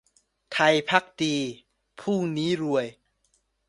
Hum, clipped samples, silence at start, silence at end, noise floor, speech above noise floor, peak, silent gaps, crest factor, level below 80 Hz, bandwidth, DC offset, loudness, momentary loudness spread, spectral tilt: none; under 0.1%; 0.5 s; 0.75 s; -70 dBFS; 46 dB; -2 dBFS; none; 24 dB; -68 dBFS; 11.5 kHz; under 0.1%; -25 LUFS; 12 LU; -4.5 dB/octave